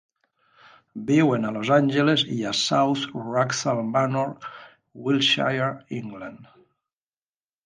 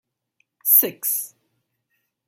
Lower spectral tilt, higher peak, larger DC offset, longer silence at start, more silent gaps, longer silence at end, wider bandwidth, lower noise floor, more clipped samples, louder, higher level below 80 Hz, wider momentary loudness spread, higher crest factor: first, -5 dB/octave vs -1.5 dB/octave; second, -6 dBFS vs -2 dBFS; neither; first, 0.95 s vs 0.65 s; neither; first, 1.2 s vs 1 s; second, 10 kHz vs 16.5 kHz; first, under -90 dBFS vs -74 dBFS; neither; second, -23 LUFS vs -18 LUFS; first, -68 dBFS vs -84 dBFS; first, 16 LU vs 13 LU; second, 18 dB vs 24 dB